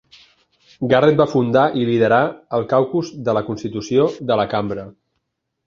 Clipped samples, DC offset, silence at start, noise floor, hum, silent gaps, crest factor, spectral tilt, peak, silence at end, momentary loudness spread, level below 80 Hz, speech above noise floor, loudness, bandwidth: under 0.1%; under 0.1%; 0.8 s; -75 dBFS; none; none; 16 dB; -7 dB/octave; -2 dBFS; 0.75 s; 11 LU; -54 dBFS; 57 dB; -18 LUFS; 7.4 kHz